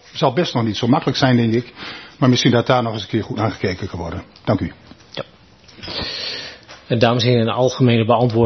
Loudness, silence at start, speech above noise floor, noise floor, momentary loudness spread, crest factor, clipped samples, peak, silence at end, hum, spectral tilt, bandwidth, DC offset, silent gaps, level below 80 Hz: -18 LUFS; 0.15 s; 30 dB; -47 dBFS; 17 LU; 18 dB; under 0.1%; 0 dBFS; 0 s; none; -6 dB/octave; 6.4 kHz; under 0.1%; none; -50 dBFS